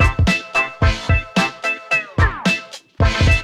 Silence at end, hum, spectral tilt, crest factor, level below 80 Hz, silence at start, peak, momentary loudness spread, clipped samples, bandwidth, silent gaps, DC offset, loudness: 0 s; none; -5 dB/octave; 16 dB; -24 dBFS; 0 s; -2 dBFS; 4 LU; under 0.1%; 12.5 kHz; none; under 0.1%; -18 LUFS